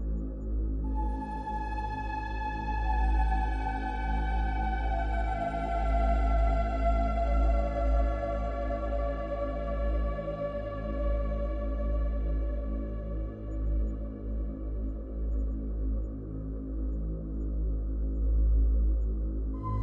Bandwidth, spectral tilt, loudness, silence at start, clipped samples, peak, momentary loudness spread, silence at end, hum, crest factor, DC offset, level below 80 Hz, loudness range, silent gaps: 4.5 kHz; -9 dB/octave; -32 LUFS; 0 s; under 0.1%; -16 dBFS; 8 LU; 0 s; none; 14 dB; under 0.1%; -30 dBFS; 6 LU; none